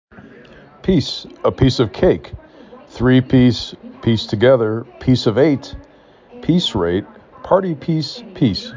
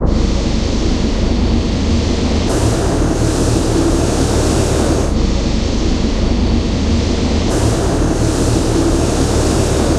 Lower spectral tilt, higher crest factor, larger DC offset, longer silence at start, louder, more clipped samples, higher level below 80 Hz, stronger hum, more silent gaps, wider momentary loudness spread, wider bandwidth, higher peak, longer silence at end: first, -7 dB/octave vs -5.5 dB/octave; about the same, 16 dB vs 12 dB; neither; first, 0.2 s vs 0 s; about the same, -17 LUFS vs -15 LUFS; neither; second, -38 dBFS vs -18 dBFS; neither; neither; first, 11 LU vs 2 LU; second, 7.6 kHz vs 14 kHz; about the same, -2 dBFS vs -2 dBFS; about the same, 0 s vs 0 s